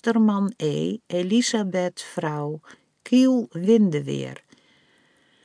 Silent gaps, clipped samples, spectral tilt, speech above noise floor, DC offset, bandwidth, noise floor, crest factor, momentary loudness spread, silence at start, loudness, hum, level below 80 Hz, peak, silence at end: none; under 0.1%; -5.5 dB/octave; 39 dB; under 0.1%; 10.5 kHz; -61 dBFS; 16 dB; 12 LU; 0.05 s; -23 LUFS; none; -74 dBFS; -8 dBFS; 1.1 s